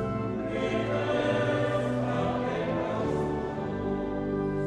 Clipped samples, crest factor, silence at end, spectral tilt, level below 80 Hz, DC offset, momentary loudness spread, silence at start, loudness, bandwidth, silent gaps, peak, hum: under 0.1%; 14 dB; 0 s; -7.5 dB/octave; -48 dBFS; under 0.1%; 5 LU; 0 s; -29 LUFS; 10.5 kHz; none; -16 dBFS; none